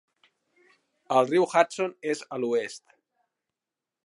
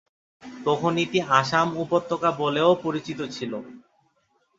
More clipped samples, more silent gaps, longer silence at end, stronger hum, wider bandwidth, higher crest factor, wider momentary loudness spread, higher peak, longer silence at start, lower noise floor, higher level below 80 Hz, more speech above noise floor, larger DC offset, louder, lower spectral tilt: neither; neither; first, 1.25 s vs 0.8 s; neither; first, 11.5 kHz vs 7.8 kHz; about the same, 24 dB vs 22 dB; about the same, 11 LU vs 12 LU; about the same, -4 dBFS vs -2 dBFS; first, 1.1 s vs 0.45 s; first, -89 dBFS vs -68 dBFS; second, -84 dBFS vs -64 dBFS; first, 63 dB vs 45 dB; neither; about the same, -26 LUFS vs -24 LUFS; about the same, -4.5 dB/octave vs -5.5 dB/octave